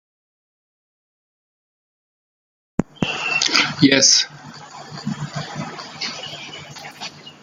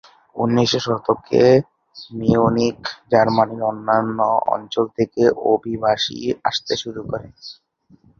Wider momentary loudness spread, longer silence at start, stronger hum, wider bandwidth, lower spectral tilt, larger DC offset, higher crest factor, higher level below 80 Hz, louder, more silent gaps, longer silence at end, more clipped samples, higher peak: first, 22 LU vs 15 LU; first, 2.8 s vs 0.35 s; neither; first, 14.5 kHz vs 7.4 kHz; second, -2 dB/octave vs -5.5 dB/octave; neither; first, 24 dB vs 18 dB; about the same, -56 dBFS vs -52 dBFS; about the same, -18 LUFS vs -19 LUFS; neither; second, 0.1 s vs 0.65 s; neither; about the same, 0 dBFS vs -2 dBFS